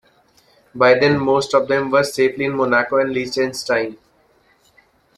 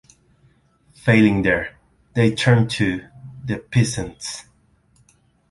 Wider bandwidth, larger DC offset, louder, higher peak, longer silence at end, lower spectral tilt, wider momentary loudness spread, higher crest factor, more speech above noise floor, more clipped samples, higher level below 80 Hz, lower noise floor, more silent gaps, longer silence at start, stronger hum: first, 14 kHz vs 11.5 kHz; neither; first, -17 LUFS vs -20 LUFS; about the same, -2 dBFS vs -2 dBFS; first, 1.25 s vs 1.1 s; about the same, -5 dB/octave vs -6 dB/octave; second, 7 LU vs 17 LU; about the same, 18 dB vs 20 dB; about the same, 40 dB vs 41 dB; neither; second, -56 dBFS vs -46 dBFS; about the same, -57 dBFS vs -59 dBFS; neither; second, 0.75 s vs 1.05 s; neither